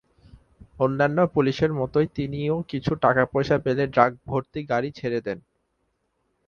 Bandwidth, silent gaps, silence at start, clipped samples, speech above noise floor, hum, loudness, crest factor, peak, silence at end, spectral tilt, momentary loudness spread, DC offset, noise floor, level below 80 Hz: 7 kHz; none; 0.35 s; under 0.1%; 50 dB; none; -24 LUFS; 22 dB; -2 dBFS; 1.1 s; -8 dB/octave; 8 LU; under 0.1%; -73 dBFS; -52 dBFS